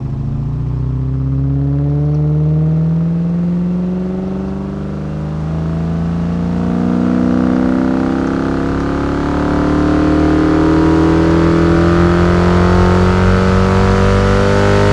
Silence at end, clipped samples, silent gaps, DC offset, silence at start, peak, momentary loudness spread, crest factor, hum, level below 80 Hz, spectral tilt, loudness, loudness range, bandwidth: 0 s; under 0.1%; none; under 0.1%; 0 s; 0 dBFS; 8 LU; 12 dB; none; -24 dBFS; -8 dB/octave; -14 LUFS; 7 LU; 10 kHz